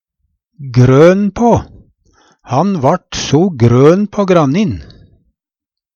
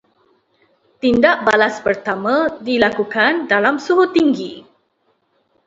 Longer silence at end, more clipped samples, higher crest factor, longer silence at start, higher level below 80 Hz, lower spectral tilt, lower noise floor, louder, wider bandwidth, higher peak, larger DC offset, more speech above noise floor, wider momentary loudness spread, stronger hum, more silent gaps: about the same, 1.15 s vs 1.05 s; neither; second, 12 dB vs 18 dB; second, 0.6 s vs 1.05 s; first, -38 dBFS vs -54 dBFS; first, -7 dB/octave vs -5 dB/octave; first, -84 dBFS vs -64 dBFS; first, -11 LUFS vs -16 LUFS; about the same, 7.4 kHz vs 7.8 kHz; about the same, 0 dBFS vs 0 dBFS; neither; first, 74 dB vs 48 dB; first, 10 LU vs 7 LU; neither; neither